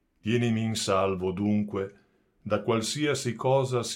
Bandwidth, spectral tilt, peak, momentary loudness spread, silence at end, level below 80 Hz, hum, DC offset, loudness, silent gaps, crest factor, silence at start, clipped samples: 16 kHz; -5 dB/octave; -12 dBFS; 7 LU; 0 s; -64 dBFS; none; under 0.1%; -27 LUFS; none; 16 dB; 0.25 s; under 0.1%